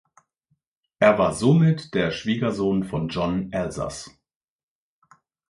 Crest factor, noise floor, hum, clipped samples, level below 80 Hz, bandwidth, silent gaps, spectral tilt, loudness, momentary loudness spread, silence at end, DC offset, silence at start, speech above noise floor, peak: 22 dB; -72 dBFS; none; under 0.1%; -50 dBFS; 11.5 kHz; none; -6.5 dB/octave; -22 LUFS; 12 LU; 1.4 s; under 0.1%; 1 s; 51 dB; -2 dBFS